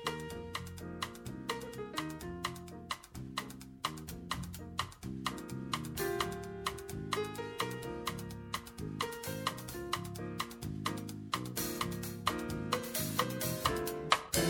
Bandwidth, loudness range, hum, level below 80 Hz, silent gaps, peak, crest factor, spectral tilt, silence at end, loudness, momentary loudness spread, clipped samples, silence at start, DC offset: 17.5 kHz; 6 LU; none; -56 dBFS; none; -10 dBFS; 30 dB; -3.5 dB/octave; 0 s; -39 LUFS; 9 LU; under 0.1%; 0 s; under 0.1%